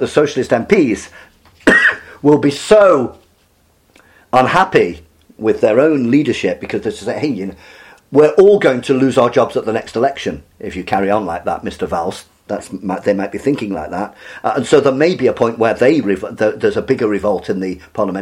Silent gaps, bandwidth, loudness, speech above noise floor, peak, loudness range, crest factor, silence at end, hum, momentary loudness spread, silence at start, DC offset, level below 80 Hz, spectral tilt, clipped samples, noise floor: none; 12.5 kHz; -15 LUFS; 41 dB; 0 dBFS; 6 LU; 14 dB; 0 s; none; 14 LU; 0 s; under 0.1%; -48 dBFS; -6 dB/octave; under 0.1%; -55 dBFS